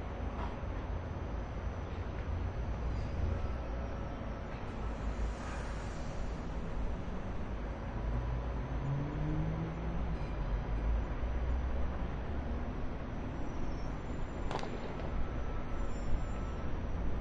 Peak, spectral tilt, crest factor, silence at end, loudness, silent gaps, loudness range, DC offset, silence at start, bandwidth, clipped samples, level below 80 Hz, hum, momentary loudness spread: -20 dBFS; -7.5 dB/octave; 16 dB; 0 s; -40 LUFS; none; 3 LU; under 0.1%; 0 s; 7.8 kHz; under 0.1%; -38 dBFS; none; 5 LU